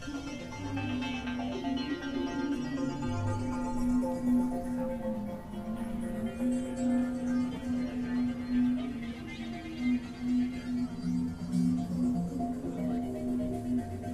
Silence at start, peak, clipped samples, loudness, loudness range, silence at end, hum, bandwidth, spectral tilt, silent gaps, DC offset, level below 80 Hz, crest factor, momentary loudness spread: 0 s; -20 dBFS; under 0.1%; -33 LUFS; 1 LU; 0 s; none; 12.5 kHz; -7 dB/octave; none; under 0.1%; -48 dBFS; 14 dB; 8 LU